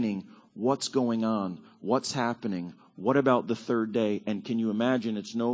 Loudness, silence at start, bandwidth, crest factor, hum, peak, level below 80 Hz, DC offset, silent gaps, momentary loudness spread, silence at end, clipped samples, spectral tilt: -29 LUFS; 0 s; 8 kHz; 20 dB; none; -8 dBFS; -72 dBFS; under 0.1%; none; 11 LU; 0 s; under 0.1%; -5.5 dB/octave